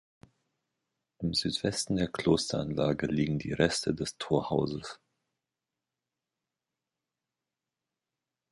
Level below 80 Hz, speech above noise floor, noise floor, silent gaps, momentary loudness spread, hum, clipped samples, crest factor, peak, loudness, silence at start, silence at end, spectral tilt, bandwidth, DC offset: -56 dBFS; 59 dB; -89 dBFS; none; 7 LU; none; under 0.1%; 24 dB; -10 dBFS; -30 LUFS; 1.2 s; 3.55 s; -5 dB/octave; 11.5 kHz; under 0.1%